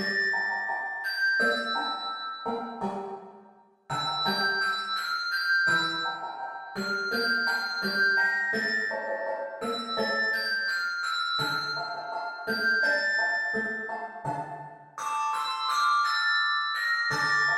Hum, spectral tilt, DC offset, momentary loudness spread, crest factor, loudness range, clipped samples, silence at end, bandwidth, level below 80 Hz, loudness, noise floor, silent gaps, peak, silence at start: none; -2.5 dB/octave; under 0.1%; 11 LU; 16 dB; 3 LU; under 0.1%; 0 s; 16.5 kHz; -72 dBFS; -27 LUFS; -56 dBFS; none; -14 dBFS; 0 s